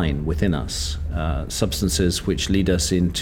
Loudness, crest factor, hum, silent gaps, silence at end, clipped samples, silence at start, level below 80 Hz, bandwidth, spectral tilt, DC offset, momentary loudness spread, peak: -22 LUFS; 18 dB; none; none; 0 s; under 0.1%; 0 s; -28 dBFS; 18.5 kHz; -5 dB/octave; under 0.1%; 6 LU; -4 dBFS